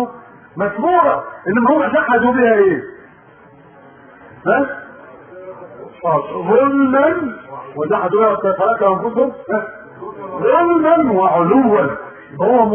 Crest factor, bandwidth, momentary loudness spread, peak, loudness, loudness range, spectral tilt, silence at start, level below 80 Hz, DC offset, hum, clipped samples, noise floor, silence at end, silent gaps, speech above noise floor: 16 dB; 3.5 kHz; 19 LU; 0 dBFS; -15 LUFS; 6 LU; -12 dB/octave; 0 s; -54 dBFS; under 0.1%; none; under 0.1%; -44 dBFS; 0 s; none; 30 dB